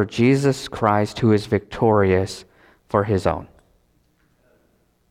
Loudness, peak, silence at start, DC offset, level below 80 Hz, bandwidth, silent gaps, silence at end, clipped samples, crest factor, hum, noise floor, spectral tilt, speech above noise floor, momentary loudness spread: -20 LUFS; -2 dBFS; 0 s; under 0.1%; -50 dBFS; 14 kHz; none; 1.65 s; under 0.1%; 18 dB; none; -63 dBFS; -7 dB/octave; 44 dB; 8 LU